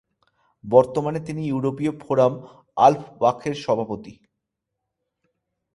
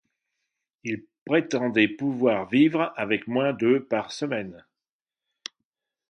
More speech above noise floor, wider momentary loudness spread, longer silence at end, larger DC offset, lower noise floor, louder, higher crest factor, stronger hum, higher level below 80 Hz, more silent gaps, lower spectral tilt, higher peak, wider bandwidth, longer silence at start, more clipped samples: second, 61 dB vs over 66 dB; second, 12 LU vs 18 LU; about the same, 1.6 s vs 1.55 s; neither; second, -82 dBFS vs under -90 dBFS; first, -21 LUFS vs -24 LUFS; about the same, 22 dB vs 20 dB; neither; first, -60 dBFS vs -70 dBFS; second, none vs 1.21-1.26 s; about the same, -7 dB/octave vs -6 dB/octave; first, 0 dBFS vs -6 dBFS; first, 11.5 kHz vs 10 kHz; second, 0.65 s vs 0.85 s; neither